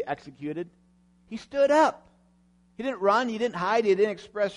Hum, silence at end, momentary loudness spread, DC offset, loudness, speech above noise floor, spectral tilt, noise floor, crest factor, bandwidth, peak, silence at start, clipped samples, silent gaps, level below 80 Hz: 60 Hz at -60 dBFS; 0 s; 15 LU; under 0.1%; -25 LUFS; 37 dB; -5 dB/octave; -62 dBFS; 18 dB; 10.5 kHz; -10 dBFS; 0 s; under 0.1%; none; -66 dBFS